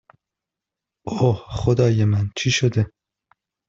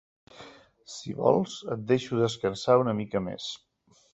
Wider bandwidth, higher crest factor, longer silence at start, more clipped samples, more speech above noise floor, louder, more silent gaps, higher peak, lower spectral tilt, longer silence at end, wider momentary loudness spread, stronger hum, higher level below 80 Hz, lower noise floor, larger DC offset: about the same, 7.8 kHz vs 8.2 kHz; about the same, 18 dB vs 22 dB; first, 1.05 s vs 0.4 s; neither; first, 67 dB vs 24 dB; first, -21 LUFS vs -27 LUFS; neither; first, -4 dBFS vs -8 dBFS; about the same, -6 dB/octave vs -6 dB/octave; first, 0.8 s vs 0.55 s; second, 10 LU vs 19 LU; neither; first, -46 dBFS vs -62 dBFS; first, -86 dBFS vs -51 dBFS; neither